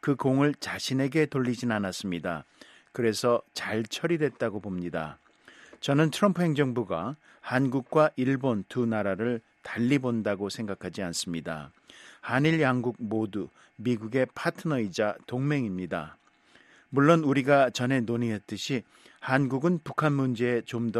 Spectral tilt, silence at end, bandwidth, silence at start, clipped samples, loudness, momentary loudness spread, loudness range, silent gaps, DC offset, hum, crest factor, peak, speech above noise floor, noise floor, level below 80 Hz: -6 dB/octave; 0 s; 13.5 kHz; 0.05 s; under 0.1%; -28 LUFS; 11 LU; 4 LU; none; under 0.1%; none; 22 dB; -6 dBFS; 33 dB; -60 dBFS; -66 dBFS